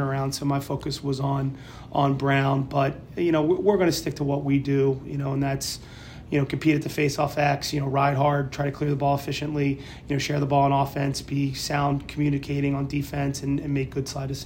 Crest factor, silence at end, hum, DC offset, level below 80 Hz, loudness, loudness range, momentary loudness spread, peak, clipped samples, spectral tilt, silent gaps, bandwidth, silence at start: 16 dB; 0 s; none; under 0.1%; -48 dBFS; -25 LUFS; 2 LU; 7 LU; -8 dBFS; under 0.1%; -6 dB/octave; none; 16.5 kHz; 0 s